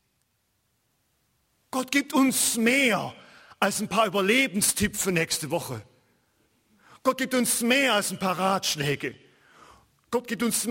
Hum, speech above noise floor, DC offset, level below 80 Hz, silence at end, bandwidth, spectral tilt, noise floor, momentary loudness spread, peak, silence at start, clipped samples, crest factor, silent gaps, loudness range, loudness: none; 48 dB; under 0.1%; -58 dBFS; 0 s; 16.5 kHz; -3 dB/octave; -73 dBFS; 11 LU; -8 dBFS; 1.75 s; under 0.1%; 20 dB; none; 3 LU; -24 LUFS